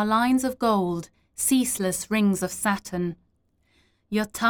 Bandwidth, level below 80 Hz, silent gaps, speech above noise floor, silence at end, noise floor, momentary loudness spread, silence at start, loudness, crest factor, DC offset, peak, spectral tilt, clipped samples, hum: over 20 kHz; -56 dBFS; none; 44 dB; 0 s; -67 dBFS; 9 LU; 0 s; -25 LUFS; 16 dB; under 0.1%; -10 dBFS; -4 dB/octave; under 0.1%; none